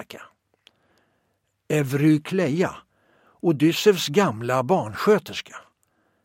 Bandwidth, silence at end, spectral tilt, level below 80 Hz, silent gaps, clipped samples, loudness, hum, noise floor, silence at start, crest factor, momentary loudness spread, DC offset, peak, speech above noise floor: 16.5 kHz; 0.65 s; -5.5 dB/octave; -66 dBFS; none; under 0.1%; -22 LUFS; none; -72 dBFS; 0 s; 18 dB; 15 LU; under 0.1%; -6 dBFS; 51 dB